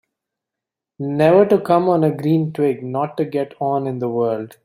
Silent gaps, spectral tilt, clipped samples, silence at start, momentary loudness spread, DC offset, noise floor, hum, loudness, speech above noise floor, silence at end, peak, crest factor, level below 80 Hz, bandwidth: none; -9 dB/octave; under 0.1%; 1 s; 9 LU; under 0.1%; -85 dBFS; none; -18 LUFS; 68 dB; 0.15 s; -2 dBFS; 18 dB; -62 dBFS; 15 kHz